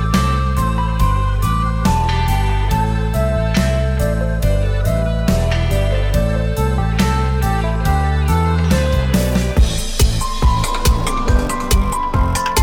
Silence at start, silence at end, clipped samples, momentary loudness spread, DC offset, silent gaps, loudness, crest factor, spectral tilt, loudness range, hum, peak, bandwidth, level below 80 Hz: 0 s; 0 s; under 0.1%; 2 LU; under 0.1%; none; -17 LUFS; 12 dB; -5.5 dB/octave; 1 LU; none; -2 dBFS; 17.5 kHz; -18 dBFS